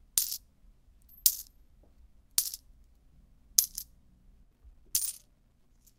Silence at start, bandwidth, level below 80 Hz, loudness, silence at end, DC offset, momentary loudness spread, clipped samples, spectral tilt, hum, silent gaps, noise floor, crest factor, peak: 0.15 s; 17.5 kHz; -60 dBFS; -30 LUFS; 0.8 s; under 0.1%; 20 LU; under 0.1%; 2.5 dB/octave; none; none; -65 dBFS; 36 dB; 0 dBFS